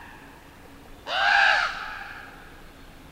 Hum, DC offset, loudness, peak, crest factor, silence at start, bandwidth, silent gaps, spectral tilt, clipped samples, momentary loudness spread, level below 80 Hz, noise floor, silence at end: none; under 0.1%; -22 LUFS; -6 dBFS; 20 dB; 0 s; 16 kHz; none; -1.5 dB/octave; under 0.1%; 25 LU; -50 dBFS; -47 dBFS; 0.05 s